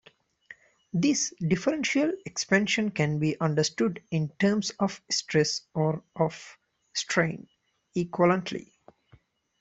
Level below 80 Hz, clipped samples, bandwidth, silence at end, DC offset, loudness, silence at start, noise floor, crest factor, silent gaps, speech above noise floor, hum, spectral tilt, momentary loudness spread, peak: -64 dBFS; under 0.1%; 8.2 kHz; 1 s; under 0.1%; -27 LUFS; 0.5 s; -61 dBFS; 20 dB; none; 34 dB; none; -4.5 dB/octave; 9 LU; -8 dBFS